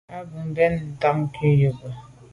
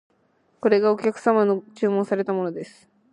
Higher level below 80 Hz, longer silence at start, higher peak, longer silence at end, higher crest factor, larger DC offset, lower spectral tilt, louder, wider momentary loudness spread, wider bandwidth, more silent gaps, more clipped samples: first, -50 dBFS vs -74 dBFS; second, 0.1 s vs 0.65 s; about the same, -6 dBFS vs -4 dBFS; second, 0.2 s vs 0.45 s; about the same, 16 dB vs 18 dB; neither; first, -9 dB/octave vs -7 dB/octave; about the same, -22 LUFS vs -22 LUFS; first, 18 LU vs 10 LU; about the same, 10.5 kHz vs 10.5 kHz; neither; neither